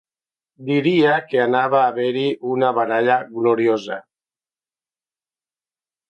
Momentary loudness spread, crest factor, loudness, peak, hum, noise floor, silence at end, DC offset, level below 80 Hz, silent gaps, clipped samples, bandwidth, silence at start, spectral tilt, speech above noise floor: 7 LU; 18 dB; -18 LUFS; -2 dBFS; none; under -90 dBFS; 2.1 s; under 0.1%; -70 dBFS; none; under 0.1%; 7.4 kHz; 0.6 s; -7 dB/octave; over 72 dB